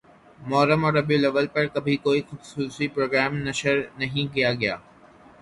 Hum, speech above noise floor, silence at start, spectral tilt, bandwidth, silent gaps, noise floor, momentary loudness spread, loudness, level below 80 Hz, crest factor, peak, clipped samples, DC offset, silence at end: none; 27 dB; 0.4 s; -5.5 dB/octave; 11.5 kHz; none; -51 dBFS; 9 LU; -23 LUFS; -58 dBFS; 18 dB; -8 dBFS; under 0.1%; under 0.1%; 0.6 s